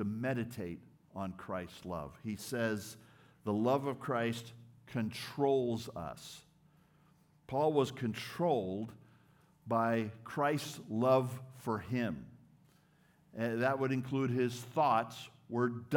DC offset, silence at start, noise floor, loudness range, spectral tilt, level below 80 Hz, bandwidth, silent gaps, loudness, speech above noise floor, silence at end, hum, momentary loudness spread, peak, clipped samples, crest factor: under 0.1%; 0 s; -68 dBFS; 3 LU; -6.5 dB/octave; -72 dBFS; 18 kHz; none; -36 LUFS; 33 dB; 0 s; none; 15 LU; -18 dBFS; under 0.1%; 18 dB